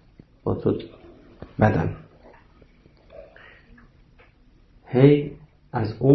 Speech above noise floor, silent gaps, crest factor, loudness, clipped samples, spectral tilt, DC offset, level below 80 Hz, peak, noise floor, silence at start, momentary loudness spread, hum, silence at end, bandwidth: 35 dB; none; 22 dB; -22 LUFS; under 0.1%; -10 dB/octave; under 0.1%; -48 dBFS; -4 dBFS; -55 dBFS; 0.45 s; 25 LU; none; 0 s; 6 kHz